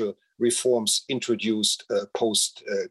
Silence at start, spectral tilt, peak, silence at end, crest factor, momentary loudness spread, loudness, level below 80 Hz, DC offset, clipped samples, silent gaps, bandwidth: 0 s; -2.5 dB/octave; -8 dBFS; 0.05 s; 16 dB; 6 LU; -24 LUFS; -76 dBFS; under 0.1%; under 0.1%; none; 13 kHz